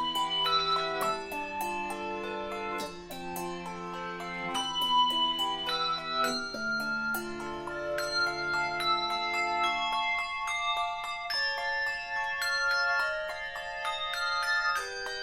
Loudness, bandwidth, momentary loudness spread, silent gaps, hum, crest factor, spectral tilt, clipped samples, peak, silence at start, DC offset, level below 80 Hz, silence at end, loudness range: -30 LUFS; 16 kHz; 10 LU; none; none; 16 dB; -2 dB/octave; under 0.1%; -16 dBFS; 0 s; under 0.1%; -58 dBFS; 0 s; 4 LU